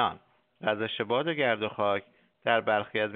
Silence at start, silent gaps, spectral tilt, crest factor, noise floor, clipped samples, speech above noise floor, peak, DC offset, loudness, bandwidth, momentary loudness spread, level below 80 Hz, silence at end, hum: 0 s; none; -2 dB/octave; 20 dB; -50 dBFS; under 0.1%; 22 dB; -8 dBFS; under 0.1%; -29 LUFS; 4.6 kHz; 7 LU; -74 dBFS; 0 s; none